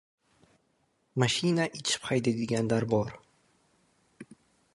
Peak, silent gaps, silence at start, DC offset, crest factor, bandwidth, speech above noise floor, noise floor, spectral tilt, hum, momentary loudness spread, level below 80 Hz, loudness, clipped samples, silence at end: -8 dBFS; none; 1.15 s; under 0.1%; 22 dB; 11.5 kHz; 44 dB; -72 dBFS; -4.5 dB/octave; none; 4 LU; -64 dBFS; -29 LUFS; under 0.1%; 0.5 s